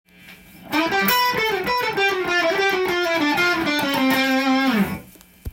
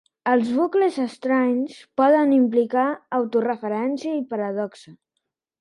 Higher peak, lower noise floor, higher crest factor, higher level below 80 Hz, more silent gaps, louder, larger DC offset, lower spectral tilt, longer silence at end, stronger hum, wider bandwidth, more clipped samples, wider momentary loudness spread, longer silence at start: about the same, -4 dBFS vs -6 dBFS; second, -45 dBFS vs -79 dBFS; about the same, 18 dB vs 16 dB; first, -50 dBFS vs -74 dBFS; neither; first, -19 LUFS vs -22 LUFS; neither; second, -4 dB/octave vs -6.5 dB/octave; second, 0 s vs 0.7 s; neither; first, 17 kHz vs 10.5 kHz; neither; second, 5 LU vs 9 LU; about the same, 0.25 s vs 0.25 s